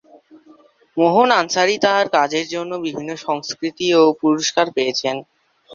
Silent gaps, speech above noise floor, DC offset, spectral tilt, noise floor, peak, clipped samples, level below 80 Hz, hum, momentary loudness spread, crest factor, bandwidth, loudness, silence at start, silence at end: none; 33 dB; under 0.1%; -3.5 dB/octave; -50 dBFS; 0 dBFS; under 0.1%; -66 dBFS; none; 11 LU; 18 dB; 7.4 kHz; -18 LUFS; 0.95 s; 0 s